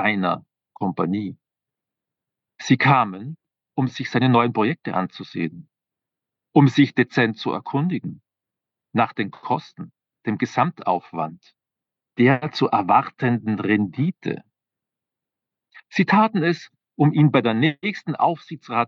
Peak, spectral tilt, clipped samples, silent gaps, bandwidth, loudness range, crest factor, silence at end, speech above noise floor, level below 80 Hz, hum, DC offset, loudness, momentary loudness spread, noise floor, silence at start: -2 dBFS; -7 dB/octave; under 0.1%; none; 7.2 kHz; 5 LU; 20 dB; 0 s; 67 dB; -80 dBFS; none; under 0.1%; -21 LUFS; 14 LU; -87 dBFS; 0 s